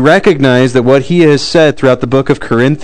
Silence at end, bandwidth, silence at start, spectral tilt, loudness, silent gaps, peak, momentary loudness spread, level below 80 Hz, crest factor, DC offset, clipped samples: 0 s; 12 kHz; 0 s; -6.5 dB/octave; -9 LUFS; none; 0 dBFS; 4 LU; -40 dBFS; 8 dB; 4%; 4%